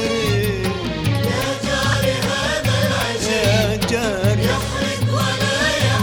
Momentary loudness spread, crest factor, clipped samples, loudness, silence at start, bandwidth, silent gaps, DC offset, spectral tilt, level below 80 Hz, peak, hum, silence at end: 4 LU; 16 dB; under 0.1%; -19 LUFS; 0 s; 19 kHz; none; under 0.1%; -4.5 dB/octave; -34 dBFS; -2 dBFS; none; 0 s